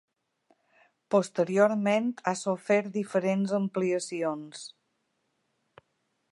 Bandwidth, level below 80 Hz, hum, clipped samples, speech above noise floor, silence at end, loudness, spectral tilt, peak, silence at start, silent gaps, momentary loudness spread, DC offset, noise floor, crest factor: 11.5 kHz; -82 dBFS; none; under 0.1%; 49 dB; 1.65 s; -28 LUFS; -5.5 dB/octave; -8 dBFS; 1.1 s; none; 10 LU; under 0.1%; -77 dBFS; 22 dB